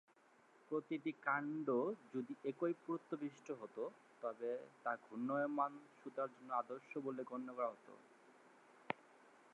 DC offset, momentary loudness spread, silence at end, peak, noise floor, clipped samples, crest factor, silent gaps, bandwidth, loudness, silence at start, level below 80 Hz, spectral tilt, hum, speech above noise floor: under 0.1%; 9 LU; 0.2 s; -22 dBFS; -71 dBFS; under 0.1%; 24 dB; none; 10.5 kHz; -44 LUFS; 0.7 s; under -90 dBFS; -7 dB/octave; none; 27 dB